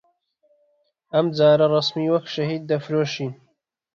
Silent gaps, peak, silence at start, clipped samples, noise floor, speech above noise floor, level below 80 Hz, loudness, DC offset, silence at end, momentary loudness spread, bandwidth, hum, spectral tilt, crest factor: none; -6 dBFS; 1.15 s; under 0.1%; -70 dBFS; 49 dB; -64 dBFS; -21 LUFS; under 0.1%; 0.6 s; 10 LU; 7.4 kHz; none; -6.5 dB/octave; 18 dB